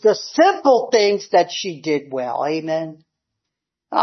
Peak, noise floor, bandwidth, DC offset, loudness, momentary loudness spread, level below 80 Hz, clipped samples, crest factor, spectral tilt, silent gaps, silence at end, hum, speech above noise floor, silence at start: -2 dBFS; -82 dBFS; 6.4 kHz; under 0.1%; -18 LUFS; 10 LU; -74 dBFS; under 0.1%; 16 dB; -4 dB/octave; none; 0 s; none; 64 dB; 0.05 s